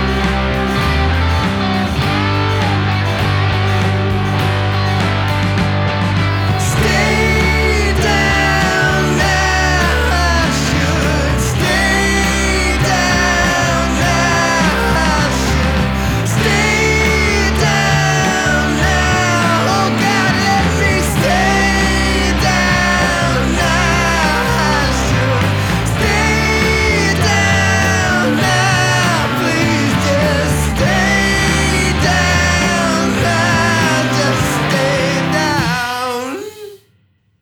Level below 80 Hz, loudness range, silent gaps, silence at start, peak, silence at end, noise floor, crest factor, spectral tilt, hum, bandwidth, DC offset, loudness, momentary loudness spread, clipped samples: -24 dBFS; 2 LU; none; 0 s; 0 dBFS; 0.65 s; -56 dBFS; 14 dB; -4.5 dB/octave; none; 19.5 kHz; under 0.1%; -13 LUFS; 3 LU; under 0.1%